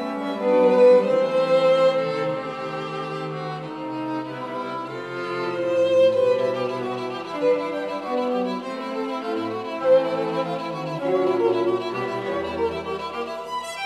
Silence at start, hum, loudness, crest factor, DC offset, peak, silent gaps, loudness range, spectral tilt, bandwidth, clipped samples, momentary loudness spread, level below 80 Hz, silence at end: 0 s; none; -23 LUFS; 16 dB; under 0.1%; -6 dBFS; none; 7 LU; -6 dB/octave; 10 kHz; under 0.1%; 12 LU; -64 dBFS; 0 s